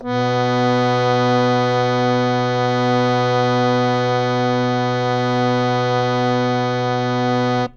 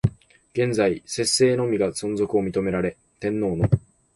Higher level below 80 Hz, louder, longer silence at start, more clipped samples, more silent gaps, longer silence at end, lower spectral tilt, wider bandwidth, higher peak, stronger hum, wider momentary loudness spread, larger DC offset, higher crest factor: about the same, -50 dBFS vs -46 dBFS; first, -18 LUFS vs -23 LUFS; about the same, 0 s vs 0.05 s; neither; neither; second, 0.05 s vs 0.35 s; first, -6.5 dB/octave vs -5 dB/octave; second, 7.4 kHz vs 11.5 kHz; about the same, -4 dBFS vs -4 dBFS; neither; second, 2 LU vs 9 LU; neither; about the same, 14 dB vs 18 dB